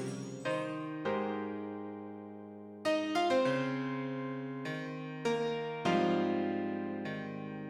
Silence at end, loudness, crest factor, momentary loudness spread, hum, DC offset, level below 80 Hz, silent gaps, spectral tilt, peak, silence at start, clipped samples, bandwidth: 0 s; -35 LUFS; 18 dB; 13 LU; none; under 0.1%; -78 dBFS; none; -6 dB/octave; -18 dBFS; 0 s; under 0.1%; 12.5 kHz